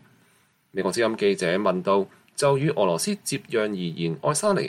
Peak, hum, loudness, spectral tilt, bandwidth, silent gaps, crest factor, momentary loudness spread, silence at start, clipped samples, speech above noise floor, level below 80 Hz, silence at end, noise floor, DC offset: -8 dBFS; none; -24 LUFS; -4.5 dB/octave; 15.5 kHz; none; 16 dB; 6 LU; 0.75 s; under 0.1%; 39 dB; -68 dBFS; 0 s; -63 dBFS; under 0.1%